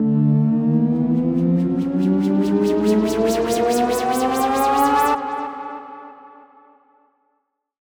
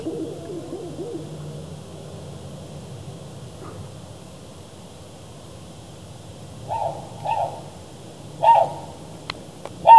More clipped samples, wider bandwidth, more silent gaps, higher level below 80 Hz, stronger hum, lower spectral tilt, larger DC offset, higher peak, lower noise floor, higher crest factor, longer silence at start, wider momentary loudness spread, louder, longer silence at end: neither; first, over 20 kHz vs 12 kHz; neither; first, -48 dBFS vs -58 dBFS; neither; about the same, -6.5 dB/octave vs -5.5 dB/octave; second, under 0.1% vs 0.3%; second, -4 dBFS vs 0 dBFS; first, -72 dBFS vs -41 dBFS; second, 14 dB vs 24 dB; about the same, 0 s vs 0 s; second, 11 LU vs 20 LU; first, -19 LUFS vs -27 LUFS; first, 1.55 s vs 0 s